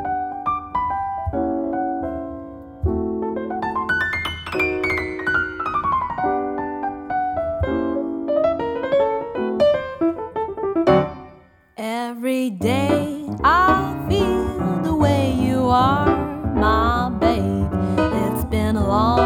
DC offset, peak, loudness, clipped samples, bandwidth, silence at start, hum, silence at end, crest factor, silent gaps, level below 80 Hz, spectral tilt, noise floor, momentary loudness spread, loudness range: under 0.1%; 0 dBFS; -21 LUFS; under 0.1%; 17.5 kHz; 0 s; none; 0 s; 20 dB; none; -36 dBFS; -7 dB/octave; -48 dBFS; 9 LU; 5 LU